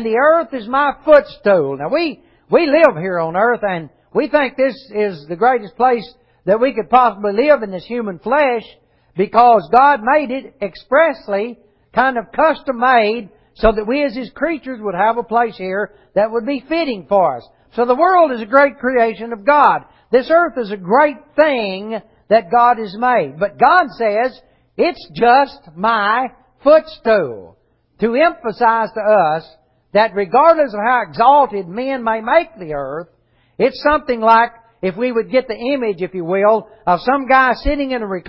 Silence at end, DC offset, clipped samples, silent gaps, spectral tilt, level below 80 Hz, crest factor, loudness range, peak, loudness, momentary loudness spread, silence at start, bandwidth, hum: 0 s; under 0.1%; under 0.1%; none; -8 dB/octave; -42 dBFS; 16 dB; 3 LU; 0 dBFS; -15 LUFS; 11 LU; 0 s; 5.8 kHz; none